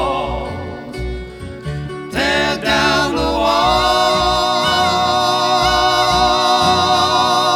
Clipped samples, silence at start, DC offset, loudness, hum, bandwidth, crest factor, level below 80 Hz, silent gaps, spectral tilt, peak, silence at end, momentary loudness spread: under 0.1%; 0 s; under 0.1%; -14 LUFS; none; 17.5 kHz; 14 dB; -32 dBFS; none; -3.5 dB/octave; -2 dBFS; 0 s; 13 LU